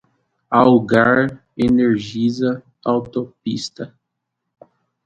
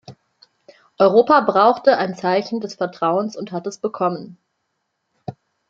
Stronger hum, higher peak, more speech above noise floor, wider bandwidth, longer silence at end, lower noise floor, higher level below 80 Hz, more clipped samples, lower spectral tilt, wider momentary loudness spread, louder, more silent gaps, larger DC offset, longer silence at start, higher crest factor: neither; about the same, 0 dBFS vs -2 dBFS; first, 61 dB vs 56 dB; about the same, 8 kHz vs 7.6 kHz; first, 1.2 s vs 0.4 s; about the same, -77 dBFS vs -74 dBFS; first, -52 dBFS vs -68 dBFS; neither; about the same, -6.5 dB/octave vs -6 dB/octave; second, 13 LU vs 19 LU; about the same, -18 LUFS vs -18 LUFS; neither; neither; first, 0.5 s vs 0.1 s; about the same, 18 dB vs 18 dB